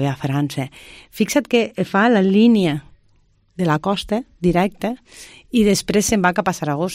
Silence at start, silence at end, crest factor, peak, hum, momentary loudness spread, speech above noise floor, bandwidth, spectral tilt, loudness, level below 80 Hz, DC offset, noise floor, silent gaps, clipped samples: 0 s; 0 s; 16 dB; -2 dBFS; none; 12 LU; 39 dB; 16 kHz; -5.5 dB/octave; -18 LUFS; -46 dBFS; under 0.1%; -57 dBFS; none; under 0.1%